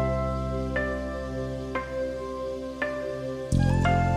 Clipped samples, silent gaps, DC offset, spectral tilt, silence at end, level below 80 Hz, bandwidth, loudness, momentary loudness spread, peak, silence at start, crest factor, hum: under 0.1%; none; under 0.1%; -7 dB/octave; 0 s; -36 dBFS; 11 kHz; -29 LUFS; 10 LU; -10 dBFS; 0 s; 16 dB; 50 Hz at -55 dBFS